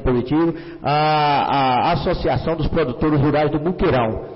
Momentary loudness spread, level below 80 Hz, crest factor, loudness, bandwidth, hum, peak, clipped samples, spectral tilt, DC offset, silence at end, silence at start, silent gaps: 4 LU; -34 dBFS; 8 dB; -19 LUFS; 5.8 kHz; none; -10 dBFS; under 0.1%; -11.5 dB/octave; under 0.1%; 0 s; 0 s; none